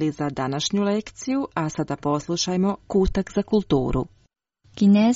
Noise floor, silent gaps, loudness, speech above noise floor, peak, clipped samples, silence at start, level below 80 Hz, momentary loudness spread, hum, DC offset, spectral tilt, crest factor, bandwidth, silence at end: -63 dBFS; none; -23 LUFS; 41 dB; -8 dBFS; under 0.1%; 0 s; -38 dBFS; 6 LU; none; under 0.1%; -6 dB/octave; 14 dB; 8 kHz; 0 s